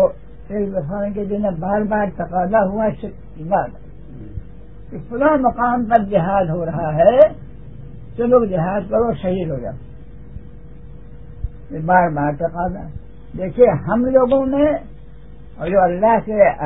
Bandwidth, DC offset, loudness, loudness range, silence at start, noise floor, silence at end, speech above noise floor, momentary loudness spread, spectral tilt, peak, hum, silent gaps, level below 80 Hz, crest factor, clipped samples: 3.9 kHz; 1%; -17 LUFS; 6 LU; 0 s; -39 dBFS; 0 s; 23 dB; 21 LU; -11.5 dB/octave; 0 dBFS; none; none; -38 dBFS; 18 dB; under 0.1%